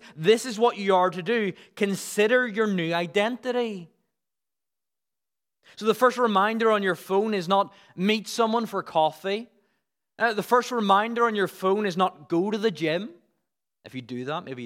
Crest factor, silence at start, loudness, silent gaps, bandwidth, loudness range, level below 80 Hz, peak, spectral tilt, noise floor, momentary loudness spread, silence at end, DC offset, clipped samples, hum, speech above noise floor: 20 dB; 0.05 s; -25 LUFS; none; 16.5 kHz; 4 LU; -82 dBFS; -6 dBFS; -5 dB/octave; under -90 dBFS; 10 LU; 0 s; under 0.1%; under 0.1%; none; over 66 dB